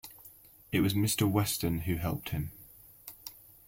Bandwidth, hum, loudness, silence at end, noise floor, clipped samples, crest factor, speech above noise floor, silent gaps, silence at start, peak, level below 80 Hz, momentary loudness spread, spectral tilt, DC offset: 16.5 kHz; none; -31 LUFS; 0.35 s; -56 dBFS; under 0.1%; 18 dB; 26 dB; none; 0.05 s; -14 dBFS; -54 dBFS; 23 LU; -5 dB/octave; under 0.1%